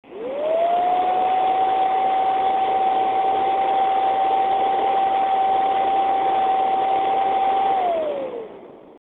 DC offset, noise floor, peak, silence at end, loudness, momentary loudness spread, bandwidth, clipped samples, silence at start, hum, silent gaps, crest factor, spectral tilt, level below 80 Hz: under 0.1%; -41 dBFS; -10 dBFS; 0.1 s; -20 LUFS; 4 LU; 4.1 kHz; under 0.1%; 0.1 s; none; none; 10 dB; -5.5 dB/octave; -60 dBFS